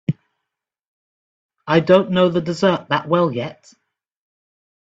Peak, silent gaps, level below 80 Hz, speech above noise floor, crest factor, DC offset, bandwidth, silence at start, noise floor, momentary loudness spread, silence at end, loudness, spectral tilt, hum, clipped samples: 0 dBFS; 0.87-1.49 s; -58 dBFS; 65 dB; 20 dB; under 0.1%; 8 kHz; 0.1 s; -82 dBFS; 16 LU; 1.45 s; -18 LUFS; -7 dB/octave; none; under 0.1%